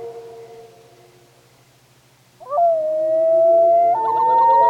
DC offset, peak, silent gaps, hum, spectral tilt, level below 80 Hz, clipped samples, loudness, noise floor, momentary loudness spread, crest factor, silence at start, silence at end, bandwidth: under 0.1%; -6 dBFS; none; none; -6 dB/octave; -66 dBFS; under 0.1%; -16 LUFS; -54 dBFS; 18 LU; 12 dB; 0 s; 0 s; 6.2 kHz